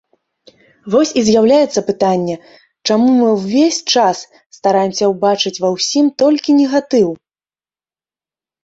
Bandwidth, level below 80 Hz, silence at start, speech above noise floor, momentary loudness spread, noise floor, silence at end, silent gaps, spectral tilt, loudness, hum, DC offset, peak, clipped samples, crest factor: 8 kHz; -56 dBFS; 0.85 s; over 77 dB; 7 LU; under -90 dBFS; 1.5 s; 4.46-4.50 s; -4.5 dB/octave; -14 LUFS; none; under 0.1%; -2 dBFS; under 0.1%; 14 dB